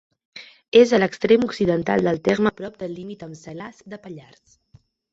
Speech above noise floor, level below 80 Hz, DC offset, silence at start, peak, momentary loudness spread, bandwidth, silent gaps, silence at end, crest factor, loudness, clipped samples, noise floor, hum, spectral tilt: 35 dB; -56 dBFS; under 0.1%; 0.35 s; -2 dBFS; 24 LU; 7.8 kHz; 0.68-0.72 s; 0.9 s; 20 dB; -19 LUFS; under 0.1%; -56 dBFS; none; -6 dB/octave